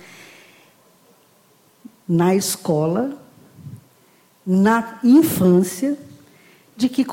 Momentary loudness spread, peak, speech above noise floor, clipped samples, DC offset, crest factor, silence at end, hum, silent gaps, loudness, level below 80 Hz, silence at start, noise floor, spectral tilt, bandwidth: 24 LU; -4 dBFS; 39 dB; under 0.1%; under 0.1%; 16 dB; 0 s; none; none; -18 LUFS; -62 dBFS; 2.1 s; -56 dBFS; -6 dB/octave; 17 kHz